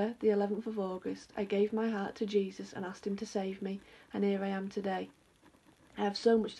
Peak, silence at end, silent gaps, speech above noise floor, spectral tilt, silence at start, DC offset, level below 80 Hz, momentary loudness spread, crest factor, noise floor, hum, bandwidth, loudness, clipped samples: -16 dBFS; 0 s; none; 30 dB; -6.5 dB/octave; 0 s; under 0.1%; -72 dBFS; 11 LU; 20 dB; -64 dBFS; none; 11.5 kHz; -35 LUFS; under 0.1%